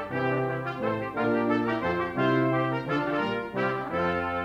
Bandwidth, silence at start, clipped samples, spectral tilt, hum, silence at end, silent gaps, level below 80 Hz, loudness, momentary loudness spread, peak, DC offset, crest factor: 9.8 kHz; 0 s; under 0.1%; -8 dB/octave; none; 0 s; none; -58 dBFS; -27 LUFS; 5 LU; -12 dBFS; under 0.1%; 14 dB